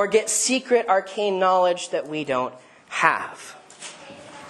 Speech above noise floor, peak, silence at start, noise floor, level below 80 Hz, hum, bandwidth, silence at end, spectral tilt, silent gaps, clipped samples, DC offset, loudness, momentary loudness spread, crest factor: 20 dB; 0 dBFS; 0 s; -42 dBFS; -72 dBFS; none; 12.5 kHz; 0 s; -2 dB/octave; none; under 0.1%; under 0.1%; -22 LUFS; 20 LU; 22 dB